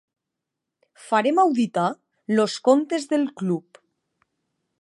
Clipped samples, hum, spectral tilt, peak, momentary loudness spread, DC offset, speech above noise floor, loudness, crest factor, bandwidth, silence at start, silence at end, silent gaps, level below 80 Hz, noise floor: under 0.1%; none; -5.5 dB/octave; -4 dBFS; 8 LU; under 0.1%; 63 dB; -22 LUFS; 20 dB; 11.5 kHz; 1 s; 1.2 s; none; -78 dBFS; -84 dBFS